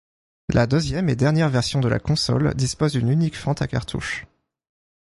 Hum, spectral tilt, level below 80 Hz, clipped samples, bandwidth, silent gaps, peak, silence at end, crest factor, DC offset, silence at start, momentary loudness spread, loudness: none; -6 dB/octave; -42 dBFS; under 0.1%; 11.5 kHz; none; -4 dBFS; 0.8 s; 18 dB; under 0.1%; 0.5 s; 8 LU; -22 LUFS